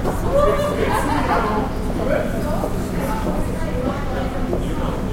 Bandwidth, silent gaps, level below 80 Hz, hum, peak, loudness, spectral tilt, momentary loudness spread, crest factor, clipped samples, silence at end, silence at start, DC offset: 16.5 kHz; none; -26 dBFS; none; -4 dBFS; -21 LUFS; -6.5 dB/octave; 6 LU; 16 dB; under 0.1%; 0 s; 0 s; under 0.1%